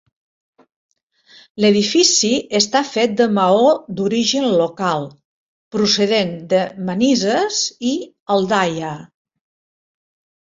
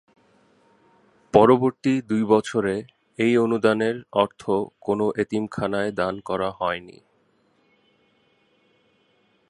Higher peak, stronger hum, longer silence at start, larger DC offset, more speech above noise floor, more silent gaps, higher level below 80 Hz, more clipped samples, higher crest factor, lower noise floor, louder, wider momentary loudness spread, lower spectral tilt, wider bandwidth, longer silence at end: about the same, -2 dBFS vs -2 dBFS; neither; first, 1.55 s vs 1.35 s; neither; second, 34 dB vs 43 dB; first, 5.25-5.71 s, 8.20-8.26 s vs none; about the same, -60 dBFS vs -58 dBFS; neither; about the same, 18 dB vs 22 dB; second, -50 dBFS vs -64 dBFS; first, -17 LUFS vs -22 LUFS; about the same, 11 LU vs 10 LU; second, -3.5 dB/octave vs -6.5 dB/octave; second, 8 kHz vs 11.5 kHz; second, 1.4 s vs 2.6 s